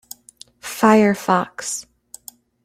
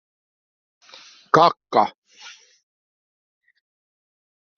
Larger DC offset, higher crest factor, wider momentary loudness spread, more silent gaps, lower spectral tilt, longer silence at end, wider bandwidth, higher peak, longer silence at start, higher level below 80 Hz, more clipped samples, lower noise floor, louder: neither; second, 18 dB vs 24 dB; about the same, 25 LU vs 26 LU; second, none vs 1.98-2.02 s; first, -4.5 dB/octave vs -3 dB/octave; second, 0.85 s vs 2.3 s; first, 16 kHz vs 7.2 kHz; about the same, -2 dBFS vs -2 dBFS; second, 0.65 s vs 1.35 s; first, -62 dBFS vs -68 dBFS; neither; about the same, -48 dBFS vs -48 dBFS; about the same, -18 LUFS vs -19 LUFS